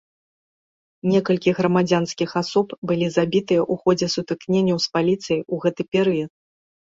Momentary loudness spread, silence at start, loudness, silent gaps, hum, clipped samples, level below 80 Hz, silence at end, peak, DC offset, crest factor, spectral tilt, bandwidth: 5 LU; 1.05 s; -21 LUFS; 2.78-2.82 s; none; under 0.1%; -60 dBFS; 0.55 s; -4 dBFS; under 0.1%; 16 dB; -6 dB/octave; 7.8 kHz